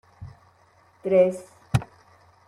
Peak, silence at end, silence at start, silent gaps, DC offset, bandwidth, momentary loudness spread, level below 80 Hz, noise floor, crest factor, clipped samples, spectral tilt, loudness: -6 dBFS; 0.65 s; 0.2 s; none; under 0.1%; 12.5 kHz; 25 LU; -48 dBFS; -59 dBFS; 22 dB; under 0.1%; -7.5 dB/octave; -24 LUFS